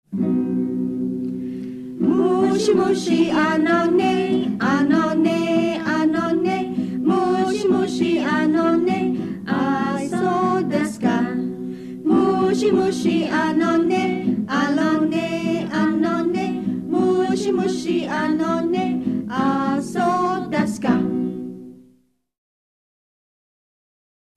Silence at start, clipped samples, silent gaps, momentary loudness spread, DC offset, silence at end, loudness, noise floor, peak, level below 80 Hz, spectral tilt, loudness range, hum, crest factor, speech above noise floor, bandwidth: 0.1 s; under 0.1%; none; 7 LU; under 0.1%; 2.6 s; -20 LUFS; -59 dBFS; -6 dBFS; -60 dBFS; -6 dB/octave; 4 LU; none; 14 dB; 42 dB; 12.5 kHz